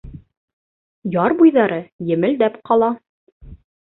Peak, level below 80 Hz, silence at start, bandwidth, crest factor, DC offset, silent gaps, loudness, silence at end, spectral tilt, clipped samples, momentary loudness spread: -2 dBFS; -50 dBFS; 0.05 s; 4.1 kHz; 16 dB; under 0.1%; 0.37-1.02 s, 1.92-1.99 s, 3.09-3.40 s; -17 LUFS; 0.4 s; -12 dB/octave; under 0.1%; 12 LU